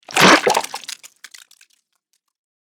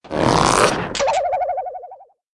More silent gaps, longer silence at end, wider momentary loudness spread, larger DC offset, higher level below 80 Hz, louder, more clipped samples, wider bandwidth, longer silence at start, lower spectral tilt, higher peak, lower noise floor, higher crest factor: neither; first, 1.7 s vs 0.3 s; first, 22 LU vs 14 LU; neither; second, -60 dBFS vs -40 dBFS; first, -13 LUFS vs -18 LUFS; neither; first, over 20 kHz vs 12 kHz; about the same, 0.1 s vs 0.05 s; second, -2.5 dB/octave vs -4 dB/octave; about the same, 0 dBFS vs -2 dBFS; first, -70 dBFS vs -41 dBFS; about the same, 20 dB vs 18 dB